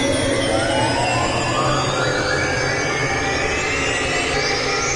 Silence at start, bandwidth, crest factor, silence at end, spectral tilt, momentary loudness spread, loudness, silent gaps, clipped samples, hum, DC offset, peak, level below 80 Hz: 0 s; 11.5 kHz; 12 dB; 0 s; -3.5 dB/octave; 1 LU; -19 LUFS; none; under 0.1%; none; under 0.1%; -6 dBFS; -36 dBFS